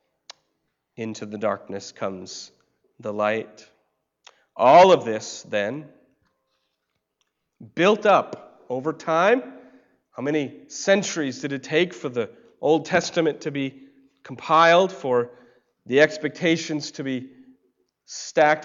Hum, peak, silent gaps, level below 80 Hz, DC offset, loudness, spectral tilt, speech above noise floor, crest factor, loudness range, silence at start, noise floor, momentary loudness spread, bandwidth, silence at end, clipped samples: none; -6 dBFS; none; -70 dBFS; under 0.1%; -22 LUFS; -4.5 dB/octave; 56 dB; 18 dB; 9 LU; 1 s; -77 dBFS; 19 LU; 7.8 kHz; 0 s; under 0.1%